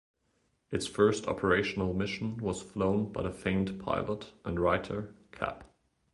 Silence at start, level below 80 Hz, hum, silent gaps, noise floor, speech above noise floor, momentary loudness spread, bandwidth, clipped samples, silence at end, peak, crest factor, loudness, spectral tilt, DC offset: 0.7 s; -52 dBFS; none; none; -75 dBFS; 43 dB; 11 LU; 11.5 kHz; under 0.1%; 0.45 s; -10 dBFS; 22 dB; -32 LUFS; -6 dB/octave; under 0.1%